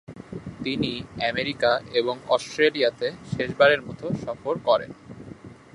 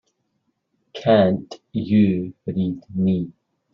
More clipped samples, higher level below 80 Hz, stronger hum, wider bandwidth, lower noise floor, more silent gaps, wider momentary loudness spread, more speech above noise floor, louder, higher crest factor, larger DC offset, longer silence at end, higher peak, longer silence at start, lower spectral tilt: neither; about the same, -56 dBFS vs -60 dBFS; neither; first, 11.5 kHz vs 6.8 kHz; second, -43 dBFS vs -72 dBFS; neither; first, 20 LU vs 13 LU; second, 19 dB vs 53 dB; second, -24 LUFS vs -21 LUFS; about the same, 22 dB vs 18 dB; neither; second, 0.2 s vs 0.4 s; about the same, -4 dBFS vs -4 dBFS; second, 0.1 s vs 0.95 s; second, -5 dB/octave vs -7 dB/octave